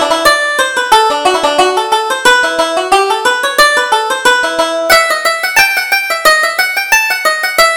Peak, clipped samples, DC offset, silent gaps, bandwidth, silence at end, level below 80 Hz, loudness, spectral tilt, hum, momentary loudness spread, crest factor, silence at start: 0 dBFS; 0.3%; under 0.1%; none; over 20 kHz; 0 s; -44 dBFS; -10 LUFS; 0 dB/octave; none; 4 LU; 10 dB; 0 s